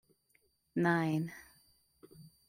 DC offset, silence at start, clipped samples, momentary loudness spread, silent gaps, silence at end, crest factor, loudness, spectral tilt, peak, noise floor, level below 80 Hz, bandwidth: under 0.1%; 0.75 s; under 0.1%; 14 LU; none; 0.2 s; 22 dB; -34 LUFS; -7.5 dB/octave; -16 dBFS; -74 dBFS; -74 dBFS; 15.5 kHz